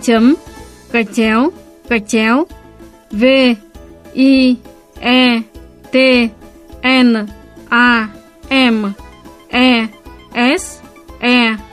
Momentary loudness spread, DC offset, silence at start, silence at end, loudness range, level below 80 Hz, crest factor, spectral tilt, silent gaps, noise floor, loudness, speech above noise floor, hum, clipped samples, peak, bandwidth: 13 LU; under 0.1%; 0 s; 0.05 s; 2 LU; -42 dBFS; 14 dB; -4 dB/octave; none; -39 dBFS; -13 LUFS; 28 dB; none; under 0.1%; 0 dBFS; 13 kHz